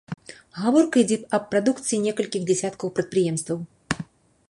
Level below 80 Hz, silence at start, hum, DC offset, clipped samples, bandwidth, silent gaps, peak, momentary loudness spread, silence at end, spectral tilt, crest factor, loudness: -60 dBFS; 0.1 s; none; under 0.1%; under 0.1%; 11.5 kHz; none; -4 dBFS; 12 LU; 0.45 s; -5 dB/octave; 20 dB; -24 LUFS